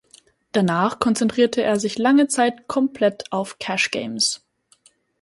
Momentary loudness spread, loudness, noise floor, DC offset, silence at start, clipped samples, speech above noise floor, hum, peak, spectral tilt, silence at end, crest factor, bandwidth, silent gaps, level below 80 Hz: 8 LU; -20 LUFS; -58 dBFS; under 0.1%; 0.55 s; under 0.1%; 38 dB; none; -2 dBFS; -4 dB/octave; 0.85 s; 18 dB; 11.5 kHz; none; -60 dBFS